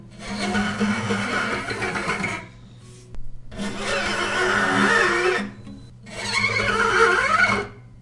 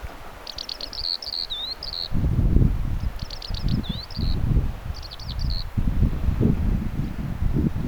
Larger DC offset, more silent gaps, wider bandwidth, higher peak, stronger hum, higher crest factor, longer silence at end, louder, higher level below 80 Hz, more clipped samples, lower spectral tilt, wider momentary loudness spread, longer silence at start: neither; neither; second, 11.5 kHz vs 20 kHz; about the same, -4 dBFS vs -2 dBFS; neither; about the same, 20 dB vs 22 dB; about the same, 0 s vs 0 s; first, -21 LUFS vs -26 LUFS; second, -44 dBFS vs -26 dBFS; neither; second, -4 dB/octave vs -6.5 dB/octave; first, 16 LU vs 11 LU; about the same, 0 s vs 0 s